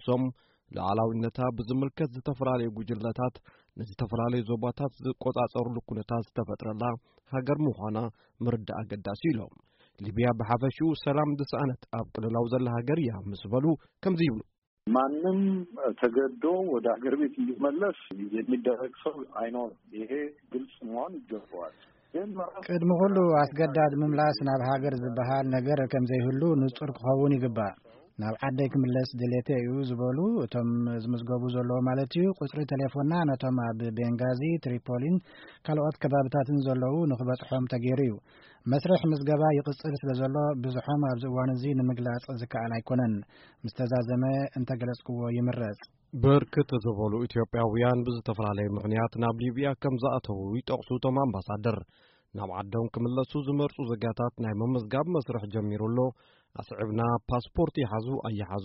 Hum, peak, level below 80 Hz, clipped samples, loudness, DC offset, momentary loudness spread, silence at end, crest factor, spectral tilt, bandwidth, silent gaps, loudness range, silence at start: none; -12 dBFS; -58 dBFS; under 0.1%; -29 LUFS; under 0.1%; 10 LU; 0 s; 18 dB; -7.5 dB/octave; 5.8 kHz; 14.58-14.77 s; 5 LU; 0 s